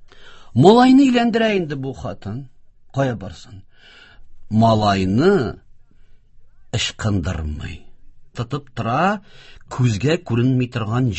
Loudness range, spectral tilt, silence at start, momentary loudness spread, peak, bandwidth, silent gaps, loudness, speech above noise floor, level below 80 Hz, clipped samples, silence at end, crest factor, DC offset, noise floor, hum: 9 LU; -6.5 dB/octave; 0 s; 19 LU; 0 dBFS; 8.4 kHz; none; -18 LUFS; 27 dB; -40 dBFS; under 0.1%; 0 s; 20 dB; under 0.1%; -45 dBFS; none